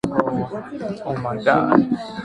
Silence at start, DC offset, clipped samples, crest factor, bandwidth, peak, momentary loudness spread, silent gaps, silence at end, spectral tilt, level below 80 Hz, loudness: 0.05 s; under 0.1%; under 0.1%; 20 dB; 11 kHz; 0 dBFS; 13 LU; none; 0 s; -7.5 dB/octave; -52 dBFS; -21 LUFS